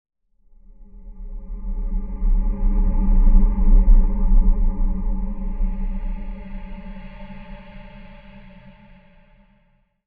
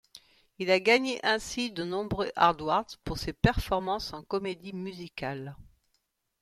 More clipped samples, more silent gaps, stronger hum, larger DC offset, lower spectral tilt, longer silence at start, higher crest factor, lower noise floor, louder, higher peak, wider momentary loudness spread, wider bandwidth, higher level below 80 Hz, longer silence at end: neither; neither; neither; first, 0.5% vs under 0.1%; first, -12 dB/octave vs -5 dB/octave; first, 0.8 s vs 0.15 s; second, 16 dB vs 24 dB; second, -61 dBFS vs -77 dBFS; first, -24 LUFS vs -29 LUFS; first, -2 dBFS vs -8 dBFS; first, 23 LU vs 14 LU; second, 2.8 kHz vs 15 kHz; first, -20 dBFS vs -46 dBFS; first, 1.35 s vs 0.8 s